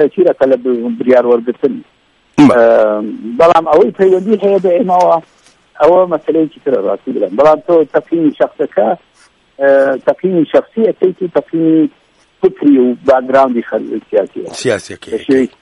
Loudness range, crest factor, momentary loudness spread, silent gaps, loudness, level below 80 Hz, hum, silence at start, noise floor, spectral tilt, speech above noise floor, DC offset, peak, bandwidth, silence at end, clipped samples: 3 LU; 12 dB; 8 LU; none; -12 LUFS; -54 dBFS; none; 0 s; -47 dBFS; -6.5 dB/octave; 36 dB; under 0.1%; 0 dBFS; 11.5 kHz; 0.15 s; under 0.1%